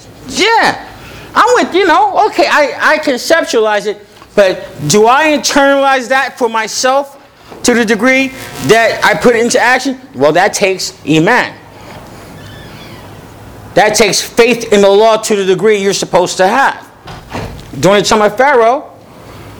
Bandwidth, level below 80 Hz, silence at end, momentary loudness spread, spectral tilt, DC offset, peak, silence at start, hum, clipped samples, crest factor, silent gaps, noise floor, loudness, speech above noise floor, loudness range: over 20 kHz; -42 dBFS; 0 s; 17 LU; -3.5 dB/octave; under 0.1%; 0 dBFS; 0.05 s; none; 0.6%; 10 dB; none; -34 dBFS; -10 LUFS; 24 dB; 4 LU